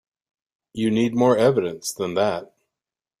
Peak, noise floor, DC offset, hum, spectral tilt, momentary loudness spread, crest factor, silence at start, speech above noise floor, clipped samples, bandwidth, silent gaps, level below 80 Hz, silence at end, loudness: -6 dBFS; -89 dBFS; under 0.1%; none; -5.5 dB/octave; 11 LU; 18 dB; 0.75 s; 68 dB; under 0.1%; 15.5 kHz; none; -62 dBFS; 0.75 s; -21 LUFS